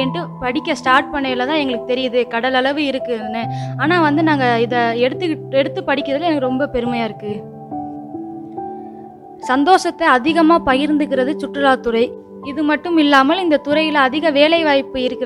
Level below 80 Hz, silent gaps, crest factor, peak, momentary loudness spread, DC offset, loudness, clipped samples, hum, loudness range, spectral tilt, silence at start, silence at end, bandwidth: -50 dBFS; none; 16 dB; 0 dBFS; 16 LU; under 0.1%; -16 LUFS; under 0.1%; none; 6 LU; -5.5 dB/octave; 0 s; 0 s; 11.5 kHz